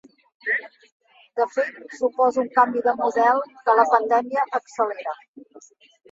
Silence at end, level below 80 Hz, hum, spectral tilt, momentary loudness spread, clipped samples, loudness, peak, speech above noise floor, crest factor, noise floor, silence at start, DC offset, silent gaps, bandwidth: 0.5 s; -74 dBFS; none; -4 dB/octave; 12 LU; under 0.1%; -22 LUFS; -4 dBFS; 29 dB; 20 dB; -50 dBFS; 0.45 s; under 0.1%; 0.92-1.00 s, 5.28-5.34 s; 7.8 kHz